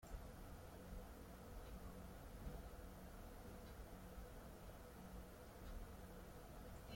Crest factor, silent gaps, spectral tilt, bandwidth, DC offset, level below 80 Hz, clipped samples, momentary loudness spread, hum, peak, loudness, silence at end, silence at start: 16 dB; none; -5.5 dB/octave; 16.5 kHz; under 0.1%; -58 dBFS; under 0.1%; 2 LU; none; -40 dBFS; -58 LUFS; 0 s; 0 s